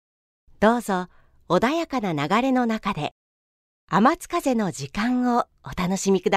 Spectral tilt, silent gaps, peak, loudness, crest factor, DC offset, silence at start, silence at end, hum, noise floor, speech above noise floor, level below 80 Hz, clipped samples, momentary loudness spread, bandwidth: -5.5 dB/octave; 3.11-3.88 s; -4 dBFS; -23 LUFS; 20 dB; under 0.1%; 0.6 s; 0 s; none; under -90 dBFS; over 68 dB; -50 dBFS; under 0.1%; 8 LU; 15 kHz